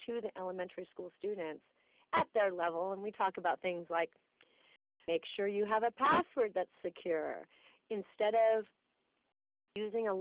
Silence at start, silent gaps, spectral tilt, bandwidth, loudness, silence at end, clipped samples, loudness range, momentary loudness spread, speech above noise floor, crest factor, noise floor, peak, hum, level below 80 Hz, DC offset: 0 s; none; -2.5 dB/octave; 4 kHz; -36 LUFS; 0 s; under 0.1%; 3 LU; 14 LU; 45 dB; 20 dB; -81 dBFS; -16 dBFS; none; -76 dBFS; under 0.1%